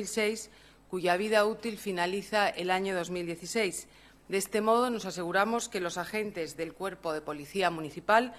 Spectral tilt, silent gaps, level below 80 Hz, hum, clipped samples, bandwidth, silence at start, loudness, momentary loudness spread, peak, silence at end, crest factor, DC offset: -3.5 dB/octave; none; -64 dBFS; none; under 0.1%; 14.5 kHz; 0 s; -31 LUFS; 10 LU; -10 dBFS; 0 s; 20 dB; under 0.1%